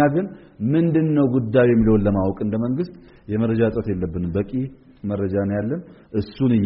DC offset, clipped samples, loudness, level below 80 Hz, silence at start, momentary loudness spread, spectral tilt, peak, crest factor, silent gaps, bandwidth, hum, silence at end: under 0.1%; under 0.1%; -21 LUFS; -40 dBFS; 0 s; 12 LU; -8.5 dB/octave; -4 dBFS; 16 dB; none; 5.4 kHz; none; 0 s